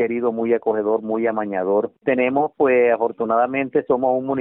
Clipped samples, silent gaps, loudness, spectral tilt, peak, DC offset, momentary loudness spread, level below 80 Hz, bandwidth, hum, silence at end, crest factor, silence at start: under 0.1%; none; -20 LUFS; -5.5 dB/octave; -6 dBFS; under 0.1%; 5 LU; -64 dBFS; 3.8 kHz; none; 0 s; 14 dB; 0 s